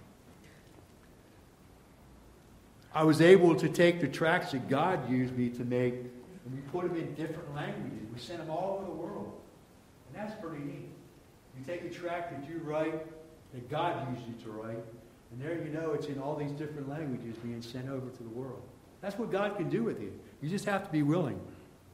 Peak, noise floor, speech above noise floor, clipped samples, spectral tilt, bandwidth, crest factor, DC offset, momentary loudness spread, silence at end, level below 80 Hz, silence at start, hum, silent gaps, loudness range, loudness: -8 dBFS; -58 dBFS; 26 dB; under 0.1%; -6.5 dB/octave; 15 kHz; 26 dB; under 0.1%; 18 LU; 0.25 s; -66 dBFS; 0 s; none; none; 14 LU; -33 LUFS